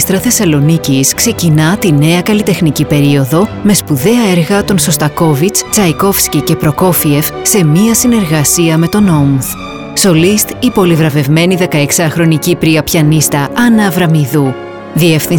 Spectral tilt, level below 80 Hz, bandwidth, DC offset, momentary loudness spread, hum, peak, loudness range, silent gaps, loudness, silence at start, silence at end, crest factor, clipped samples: -5 dB/octave; -36 dBFS; 20 kHz; under 0.1%; 3 LU; none; 0 dBFS; 1 LU; none; -9 LUFS; 0 s; 0 s; 10 dB; under 0.1%